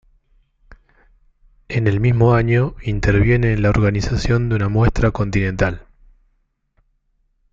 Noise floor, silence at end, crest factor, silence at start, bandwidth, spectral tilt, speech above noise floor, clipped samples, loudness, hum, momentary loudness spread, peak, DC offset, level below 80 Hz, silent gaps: -65 dBFS; 1.7 s; 16 dB; 0.7 s; 7.6 kHz; -7.5 dB/octave; 49 dB; under 0.1%; -17 LUFS; none; 7 LU; -2 dBFS; under 0.1%; -30 dBFS; none